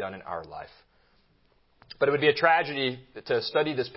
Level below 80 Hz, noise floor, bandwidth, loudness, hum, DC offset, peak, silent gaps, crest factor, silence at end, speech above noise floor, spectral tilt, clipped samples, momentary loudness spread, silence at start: -66 dBFS; -65 dBFS; 5.8 kHz; -26 LUFS; none; under 0.1%; -6 dBFS; none; 22 dB; 0 s; 38 dB; -8.5 dB/octave; under 0.1%; 20 LU; 0 s